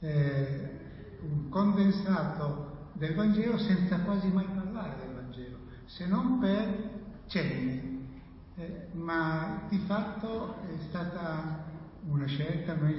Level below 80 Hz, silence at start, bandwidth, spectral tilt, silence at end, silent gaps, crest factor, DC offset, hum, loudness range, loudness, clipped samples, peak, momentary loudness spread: -54 dBFS; 0 s; 5.8 kHz; -11 dB/octave; 0 s; none; 16 dB; under 0.1%; none; 5 LU; -32 LUFS; under 0.1%; -16 dBFS; 15 LU